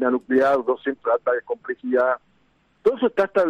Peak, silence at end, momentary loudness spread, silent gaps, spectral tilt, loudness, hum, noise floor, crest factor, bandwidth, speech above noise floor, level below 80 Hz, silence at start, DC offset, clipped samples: -8 dBFS; 0 s; 8 LU; none; -6.5 dB/octave; -22 LUFS; none; -62 dBFS; 14 dB; 7.8 kHz; 41 dB; -64 dBFS; 0 s; under 0.1%; under 0.1%